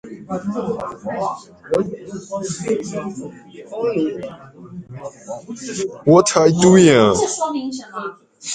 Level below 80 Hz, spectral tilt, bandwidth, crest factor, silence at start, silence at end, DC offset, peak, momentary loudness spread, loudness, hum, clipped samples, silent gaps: -52 dBFS; -5 dB/octave; 9.6 kHz; 18 dB; 0.05 s; 0 s; under 0.1%; 0 dBFS; 22 LU; -18 LUFS; none; under 0.1%; none